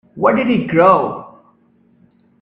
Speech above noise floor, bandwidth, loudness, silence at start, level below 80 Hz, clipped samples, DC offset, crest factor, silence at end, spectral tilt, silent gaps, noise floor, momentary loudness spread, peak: 41 dB; 5.4 kHz; -14 LUFS; 0.15 s; -56 dBFS; under 0.1%; under 0.1%; 16 dB; 1.15 s; -9 dB/octave; none; -54 dBFS; 12 LU; 0 dBFS